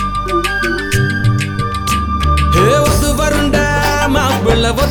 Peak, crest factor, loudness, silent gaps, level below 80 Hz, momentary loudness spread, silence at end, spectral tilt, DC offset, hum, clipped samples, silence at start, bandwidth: 0 dBFS; 12 dB; -13 LUFS; none; -20 dBFS; 5 LU; 0 s; -5 dB/octave; under 0.1%; none; under 0.1%; 0 s; over 20 kHz